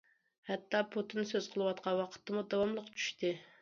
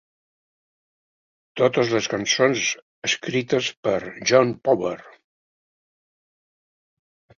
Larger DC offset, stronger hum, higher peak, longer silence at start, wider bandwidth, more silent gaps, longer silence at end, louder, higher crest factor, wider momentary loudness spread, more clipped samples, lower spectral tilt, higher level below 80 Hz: neither; neither; second, -18 dBFS vs -2 dBFS; second, 0.45 s vs 1.55 s; about the same, 7.4 kHz vs 7.4 kHz; second, none vs 2.82-3.02 s, 3.77-3.83 s; second, 0.15 s vs 2.3 s; second, -37 LUFS vs -22 LUFS; about the same, 20 dB vs 22 dB; about the same, 5 LU vs 7 LU; neither; about the same, -3.5 dB/octave vs -3.5 dB/octave; second, -78 dBFS vs -64 dBFS